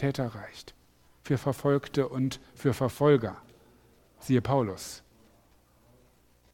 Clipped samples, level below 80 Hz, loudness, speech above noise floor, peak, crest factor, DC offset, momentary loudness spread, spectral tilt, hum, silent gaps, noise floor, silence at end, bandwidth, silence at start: under 0.1%; -58 dBFS; -29 LUFS; 35 dB; -10 dBFS; 22 dB; under 0.1%; 21 LU; -7 dB/octave; none; none; -63 dBFS; 1.55 s; 16.5 kHz; 0 s